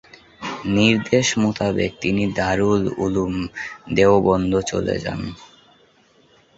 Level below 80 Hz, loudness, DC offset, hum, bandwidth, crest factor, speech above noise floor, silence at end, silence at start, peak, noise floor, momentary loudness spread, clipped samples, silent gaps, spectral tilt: -44 dBFS; -20 LUFS; under 0.1%; none; 8 kHz; 18 dB; 36 dB; 1.15 s; 0.4 s; -2 dBFS; -56 dBFS; 13 LU; under 0.1%; none; -5 dB/octave